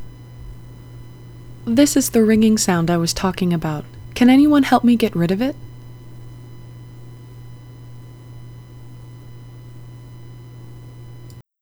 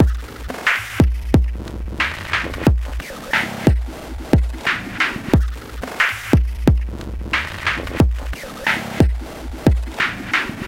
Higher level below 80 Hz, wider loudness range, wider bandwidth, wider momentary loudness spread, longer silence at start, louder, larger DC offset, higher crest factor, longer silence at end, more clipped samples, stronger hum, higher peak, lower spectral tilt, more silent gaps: second, -44 dBFS vs -24 dBFS; first, 23 LU vs 1 LU; first, over 20 kHz vs 16.5 kHz; first, 26 LU vs 12 LU; about the same, 0 s vs 0 s; first, -16 LUFS vs -20 LUFS; neither; about the same, 20 dB vs 20 dB; first, 0.2 s vs 0 s; neither; neither; about the same, 0 dBFS vs 0 dBFS; about the same, -5 dB/octave vs -6 dB/octave; neither